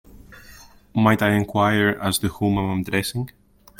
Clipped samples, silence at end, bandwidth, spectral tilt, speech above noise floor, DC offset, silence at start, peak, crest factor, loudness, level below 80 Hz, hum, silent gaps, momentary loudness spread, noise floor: under 0.1%; 0.5 s; 17 kHz; -5.5 dB/octave; 26 dB; under 0.1%; 0.15 s; -4 dBFS; 18 dB; -21 LUFS; -48 dBFS; none; none; 10 LU; -47 dBFS